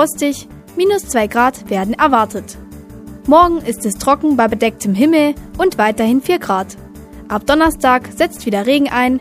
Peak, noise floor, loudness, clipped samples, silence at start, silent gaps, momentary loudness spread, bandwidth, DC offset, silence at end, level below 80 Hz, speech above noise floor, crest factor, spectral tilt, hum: 0 dBFS; -33 dBFS; -14 LUFS; under 0.1%; 0 s; none; 15 LU; 15.5 kHz; under 0.1%; 0 s; -38 dBFS; 19 dB; 14 dB; -4.5 dB/octave; none